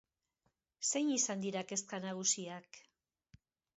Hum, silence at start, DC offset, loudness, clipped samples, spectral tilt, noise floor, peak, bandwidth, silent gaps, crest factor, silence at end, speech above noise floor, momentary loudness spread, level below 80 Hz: none; 0.8 s; under 0.1%; -36 LUFS; under 0.1%; -4 dB/octave; -83 dBFS; -20 dBFS; 8 kHz; none; 20 dB; 0.95 s; 45 dB; 9 LU; -84 dBFS